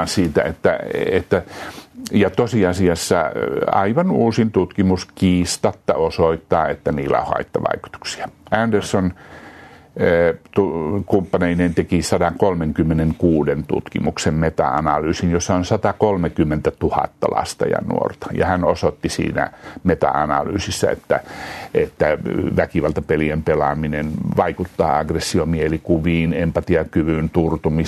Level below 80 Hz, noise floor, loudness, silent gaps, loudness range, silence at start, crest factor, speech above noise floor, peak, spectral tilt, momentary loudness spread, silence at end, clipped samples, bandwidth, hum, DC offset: -40 dBFS; -42 dBFS; -19 LUFS; none; 3 LU; 0 s; 16 dB; 23 dB; -2 dBFS; -6 dB/octave; 5 LU; 0 s; under 0.1%; 13.5 kHz; none; under 0.1%